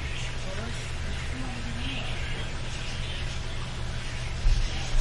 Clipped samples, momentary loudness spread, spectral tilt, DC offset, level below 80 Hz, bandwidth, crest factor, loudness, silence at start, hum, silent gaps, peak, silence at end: under 0.1%; 5 LU; -4 dB/octave; under 0.1%; -32 dBFS; 11.5 kHz; 16 dB; -33 LUFS; 0 s; none; none; -12 dBFS; 0 s